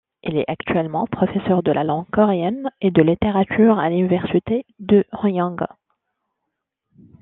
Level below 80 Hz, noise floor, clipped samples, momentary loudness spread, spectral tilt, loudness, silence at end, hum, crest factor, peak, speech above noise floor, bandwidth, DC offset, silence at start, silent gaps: -50 dBFS; -79 dBFS; under 0.1%; 8 LU; -11 dB/octave; -19 LUFS; 1.55 s; none; 18 dB; -2 dBFS; 61 dB; 4 kHz; under 0.1%; 0.25 s; none